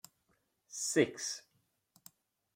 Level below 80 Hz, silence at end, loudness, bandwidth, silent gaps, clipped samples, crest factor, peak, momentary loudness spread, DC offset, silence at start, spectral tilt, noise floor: -80 dBFS; 1.15 s; -35 LUFS; 16.5 kHz; none; under 0.1%; 24 dB; -14 dBFS; 15 LU; under 0.1%; 0.7 s; -3 dB/octave; -78 dBFS